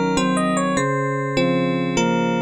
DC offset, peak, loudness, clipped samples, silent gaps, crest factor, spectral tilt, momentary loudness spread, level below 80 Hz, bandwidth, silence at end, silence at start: under 0.1%; -6 dBFS; -20 LUFS; under 0.1%; none; 14 dB; -5.5 dB/octave; 2 LU; -48 dBFS; 11.5 kHz; 0 s; 0 s